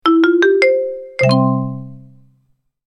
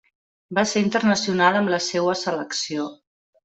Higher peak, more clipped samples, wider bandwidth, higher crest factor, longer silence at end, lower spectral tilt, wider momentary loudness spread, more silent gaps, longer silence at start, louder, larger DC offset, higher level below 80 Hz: first, 0 dBFS vs -4 dBFS; neither; first, 10.5 kHz vs 8.2 kHz; about the same, 16 dB vs 18 dB; first, 0.9 s vs 0.5 s; first, -7 dB/octave vs -4 dB/octave; first, 13 LU vs 9 LU; neither; second, 0.05 s vs 0.5 s; first, -14 LUFS vs -22 LUFS; neither; first, -56 dBFS vs -64 dBFS